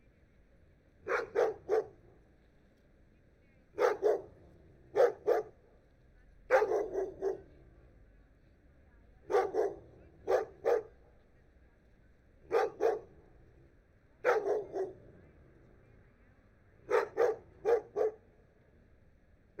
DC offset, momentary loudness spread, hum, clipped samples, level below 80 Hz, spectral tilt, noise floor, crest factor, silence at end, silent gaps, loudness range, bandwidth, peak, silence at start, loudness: under 0.1%; 17 LU; none; under 0.1%; -66 dBFS; -5 dB/octave; -65 dBFS; 22 dB; 1.45 s; none; 5 LU; 14.5 kHz; -16 dBFS; 1.05 s; -33 LUFS